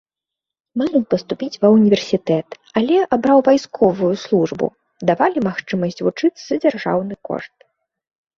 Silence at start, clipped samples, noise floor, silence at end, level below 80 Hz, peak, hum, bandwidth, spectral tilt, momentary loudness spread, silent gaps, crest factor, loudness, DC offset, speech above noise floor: 0.75 s; under 0.1%; -85 dBFS; 0.9 s; -58 dBFS; -2 dBFS; none; 7.4 kHz; -6.5 dB/octave; 11 LU; none; 16 dB; -18 LUFS; under 0.1%; 68 dB